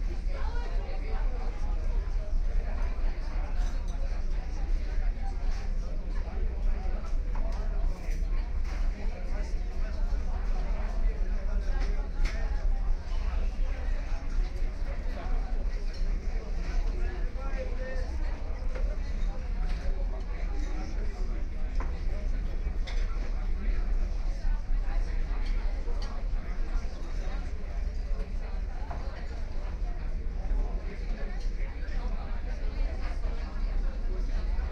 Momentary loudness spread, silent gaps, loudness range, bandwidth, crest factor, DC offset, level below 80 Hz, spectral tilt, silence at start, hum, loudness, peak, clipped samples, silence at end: 3 LU; none; 3 LU; 6.6 kHz; 12 dB; under 0.1%; -28 dBFS; -6.5 dB/octave; 0 s; none; -36 LUFS; -18 dBFS; under 0.1%; 0 s